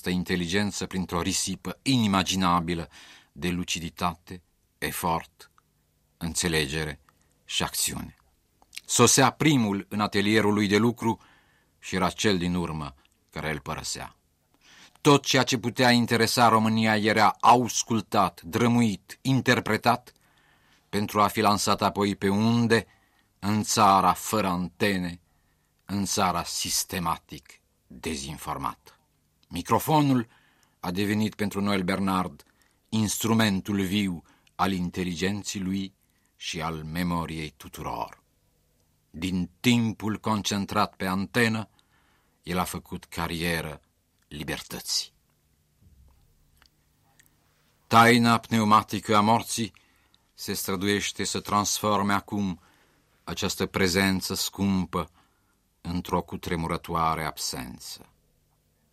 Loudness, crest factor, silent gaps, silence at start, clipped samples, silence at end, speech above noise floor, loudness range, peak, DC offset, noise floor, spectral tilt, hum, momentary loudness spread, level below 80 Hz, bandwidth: -25 LUFS; 22 dB; none; 0.05 s; under 0.1%; 0.95 s; 43 dB; 9 LU; -6 dBFS; under 0.1%; -69 dBFS; -4 dB/octave; none; 16 LU; -54 dBFS; 16 kHz